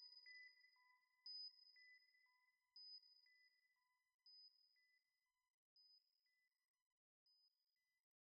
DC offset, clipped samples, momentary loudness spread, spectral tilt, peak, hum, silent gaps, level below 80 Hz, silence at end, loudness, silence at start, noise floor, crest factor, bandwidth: under 0.1%; under 0.1%; 13 LU; 7 dB/octave; -52 dBFS; none; 4.14-4.19 s, 5.50-5.76 s, 6.68-6.74 s, 6.82-7.26 s; under -90 dBFS; 0.85 s; -61 LUFS; 0 s; under -90 dBFS; 18 dB; 5.2 kHz